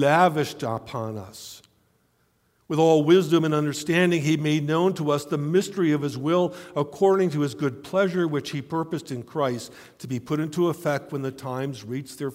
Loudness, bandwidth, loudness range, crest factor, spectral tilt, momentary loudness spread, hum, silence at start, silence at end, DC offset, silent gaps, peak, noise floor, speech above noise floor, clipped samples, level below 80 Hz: -24 LUFS; 16 kHz; 6 LU; 18 dB; -6 dB/octave; 14 LU; none; 0 s; 0 s; under 0.1%; none; -6 dBFS; -67 dBFS; 43 dB; under 0.1%; -66 dBFS